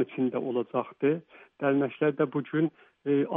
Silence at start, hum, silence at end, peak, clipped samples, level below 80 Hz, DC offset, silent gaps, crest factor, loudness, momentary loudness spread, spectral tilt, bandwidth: 0 s; none; 0 s; -12 dBFS; under 0.1%; -78 dBFS; under 0.1%; none; 16 dB; -29 LUFS; 5 LU; -6.5 dB/octave; 3.8 kHz